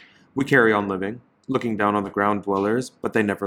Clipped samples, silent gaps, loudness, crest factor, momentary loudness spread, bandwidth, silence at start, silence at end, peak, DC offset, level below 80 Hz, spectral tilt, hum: under 0.1%; none; -22 LUFS; 20 dB; 11 LU; 15.5 kHz; 0.35 s; 0 s; -4 dBFS; under 0.1%; -62 dBFS; -6.5 dB/octave; none